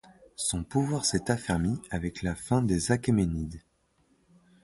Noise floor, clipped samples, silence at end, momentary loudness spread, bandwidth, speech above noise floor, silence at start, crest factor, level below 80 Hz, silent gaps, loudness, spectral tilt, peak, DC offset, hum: -69 dBFS; under 0.1%; 1.05 s; 9 LU; 12 kHz; 40 dB; 0.4 s; 20 dB; -46 dBFS; none; -29 LUFS; -5 dB/octave; -10 dBFS; under 0.1%; none